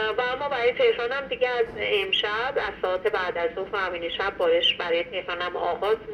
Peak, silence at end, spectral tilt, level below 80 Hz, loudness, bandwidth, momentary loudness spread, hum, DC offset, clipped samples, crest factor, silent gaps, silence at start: -10 dBFS; 0 s; -4 dB/octave; -54 dBFS; -25 LUFS; 9 kHz; 6 LU; none; under 0.1%; under 0.1%; 16 dB; none; 0 s